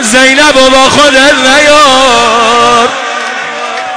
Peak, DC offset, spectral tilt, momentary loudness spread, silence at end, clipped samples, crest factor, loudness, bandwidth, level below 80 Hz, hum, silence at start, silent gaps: 0 dBFS; under 0.1%; -1.5 dB/octave; 11 LU; 0 s; 4%; 6 dB; -4 LUFS; 11 kHz; -34 dBFS; none; 0 s; none